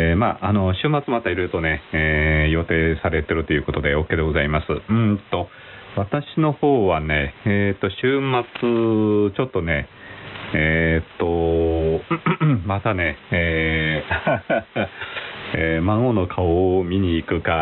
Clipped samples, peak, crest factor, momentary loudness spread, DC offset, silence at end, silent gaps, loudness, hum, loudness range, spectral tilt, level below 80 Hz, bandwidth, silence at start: under 0.1%; -6 dBFS; 14 dB; 7 LU; under 0.1%; 0 s; none; -21 LUFS; none; 2 LU; -5.5 dB/octave; -34 dBFS; 4.2 kHz; 0 s